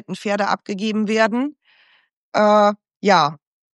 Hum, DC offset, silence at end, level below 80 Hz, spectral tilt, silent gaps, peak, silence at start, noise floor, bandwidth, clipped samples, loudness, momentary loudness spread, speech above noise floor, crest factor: none; under 0.1%; 0.4 s; -76 dBFS; -5 dB/octave; 2.13-2.32 s; -2 dBFS; 0.1 s; -57 dBFS; 10.5 kHz; under 0.1%; -19 LUFS; 9 LU; 40 dB; 18 dB